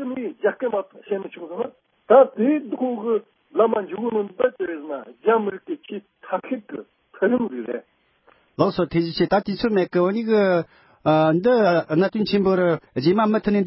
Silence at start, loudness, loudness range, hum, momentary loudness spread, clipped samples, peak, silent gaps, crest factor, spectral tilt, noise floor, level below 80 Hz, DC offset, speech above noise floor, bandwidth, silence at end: 0 s; -21 LUFS; 6 LU; none; 14 LU; under 0.1%; -2 dBFS; none; 20 dB; -11 dB/octave; -59 dBFS; -58 dBFS; under 0.1%; 39 dB; 5.8 kHz; 0 s